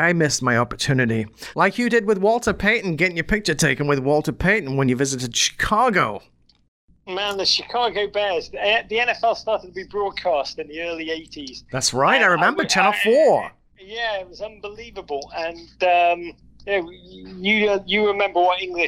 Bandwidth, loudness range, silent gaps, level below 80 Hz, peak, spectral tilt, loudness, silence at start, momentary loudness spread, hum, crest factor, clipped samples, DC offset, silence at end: 16 kHz; 5 LU; 6.68-6.88 s; -46 dBFS; -2 dBFS; -3.5 dB/octave; -20 LUFS; 0 s; 14 LU; none; 18 dB; under 0.1%; under 0.1%; 0 s